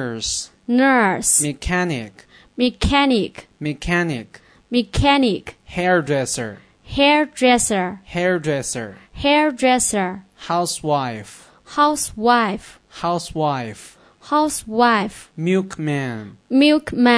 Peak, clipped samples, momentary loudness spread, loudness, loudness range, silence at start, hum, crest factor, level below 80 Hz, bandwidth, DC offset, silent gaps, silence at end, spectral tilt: -2 dBFS; under 0.1%; 13 LU; -19 LUFS; 3 LU; 0 s; none; 18 dB; -40 dBFS; 11 kHz; under 0.1%; none; 0 s; -4 dB/octave